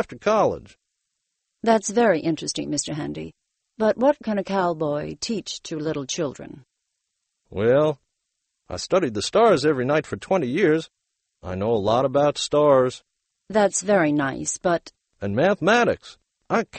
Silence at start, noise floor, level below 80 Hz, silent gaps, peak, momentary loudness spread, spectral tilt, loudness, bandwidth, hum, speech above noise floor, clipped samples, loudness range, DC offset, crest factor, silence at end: 0 s; -79 dBFS; -56 dBFS; none; -6 dBFS; 14 LU; -4.5 dB/octave; -22 LUFS; 8.8 kHz; none; 57 dB; under 0.1%; 5 LU; under 0.1%; 18 dB; 0 s